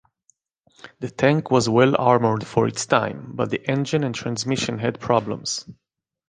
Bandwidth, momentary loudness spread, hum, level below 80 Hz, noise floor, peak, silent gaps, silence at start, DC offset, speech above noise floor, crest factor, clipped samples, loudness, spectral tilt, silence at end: 9.8 kHz; 11 LU; none; -58 dBFS; -65 dBFS; -2 dBFS; none; 0.85 s; under 0.1%; 44 dB; 20 dB; under 0.1%; -21 LUFS; -5 dB/octave; 0.55 s